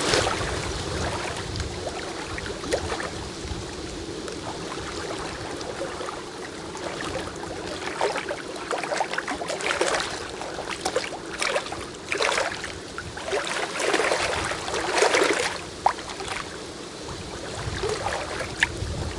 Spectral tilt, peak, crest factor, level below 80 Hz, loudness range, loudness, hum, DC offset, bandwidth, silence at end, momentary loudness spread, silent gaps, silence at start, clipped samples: -3 dB/octave; -2 dBFS; 26 dB; -44 dBFS; 8 LU; -28 LUFS; none; under 0.1%; 11.5 kHz; 0 s; 11 LU; none; 0 s; under 0.1%